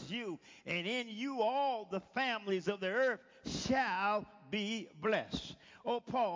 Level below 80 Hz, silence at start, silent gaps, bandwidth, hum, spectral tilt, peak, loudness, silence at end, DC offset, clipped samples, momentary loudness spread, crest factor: -66 dBFS; 0 s; none; 7.6 kHz; none; -4.5 dB/octave; -22 dBFS; -37 LUFS; 0 s; under 0.1%; under 0.1%; 10 LU; 16 dB